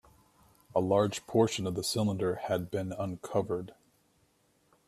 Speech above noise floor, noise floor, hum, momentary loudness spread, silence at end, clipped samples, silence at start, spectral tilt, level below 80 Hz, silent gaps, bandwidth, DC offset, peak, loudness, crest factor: 39 dB; -70 dBFS; none; 8 LU; 1.15 s; under 0.1%; 0.75 s; -5.5 dB/octave; -66 dBFS; none; 15 kHz; under 0.1%; -12 dBFS; -31 LUFS; 20 dB